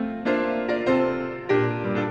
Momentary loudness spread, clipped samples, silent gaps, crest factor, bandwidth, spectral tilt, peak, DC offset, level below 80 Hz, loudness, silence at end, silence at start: 4 LU; under 0.1%; none; 14 dB; 8.4 kHz; -8 dB/octave; -10 dBFS; under 0.1%; -54 dBFS; -24 LUFS; 0 s; 0 s